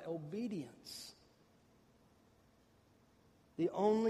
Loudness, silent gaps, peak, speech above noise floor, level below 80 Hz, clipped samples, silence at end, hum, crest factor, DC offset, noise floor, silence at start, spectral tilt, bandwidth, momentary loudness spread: -41 LUFS; none; -20 dBFS; 32 dB; -78 dBFS; under 0.1%; 0 s; none; 20 dB; under 0.1%; -70 dBFS; 0 s; -6.5 dB/octave; 15 kHz; 17 LU